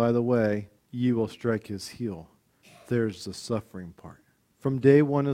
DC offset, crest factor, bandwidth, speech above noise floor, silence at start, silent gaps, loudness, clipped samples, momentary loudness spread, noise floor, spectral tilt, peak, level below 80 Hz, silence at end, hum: under 0.1%; 20 dB; 15 kHz; 31 dB; 0 s; none; -27 LUFS; under 0.1%; 19 LU; -57 dBFS; -7.5 dB/octave; -6 dBFS; -62 dBFS; 0 s; none